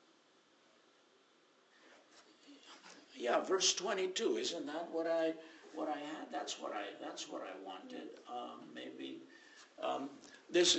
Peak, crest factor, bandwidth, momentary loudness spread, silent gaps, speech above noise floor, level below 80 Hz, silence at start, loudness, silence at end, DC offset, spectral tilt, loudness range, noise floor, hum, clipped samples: -18 dBFS; 24 dB; 8.2 kHz; 24 LU; none; 31 dB; -84 dBFS; 1.85 s; -39 LUFS; 0 s; under 0.1%; -1.5 dB/octave; 10 LU; -70 dBFS; none; under 0.1%